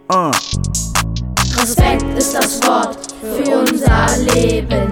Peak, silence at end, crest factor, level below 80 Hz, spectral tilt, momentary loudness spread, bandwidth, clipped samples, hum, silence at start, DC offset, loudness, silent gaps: 0 dBFS; 0 s; 14 dB; -24 dBFS; -4 dB/octave; 6 LU; 19 kHz; under 0.1%; none; 0.1 s; under 0.1%; -15 LUFS; none